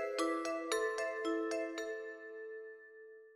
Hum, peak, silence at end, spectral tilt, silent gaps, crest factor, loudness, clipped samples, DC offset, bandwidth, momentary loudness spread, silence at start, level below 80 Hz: none; -22 dBFS; 0 s; -1 dB/octave; none; 18 dB; -39 LUFS; under 0.1%; under 0.1%; 15.5 kHz; 17 LU; 0 s; -80 dBFS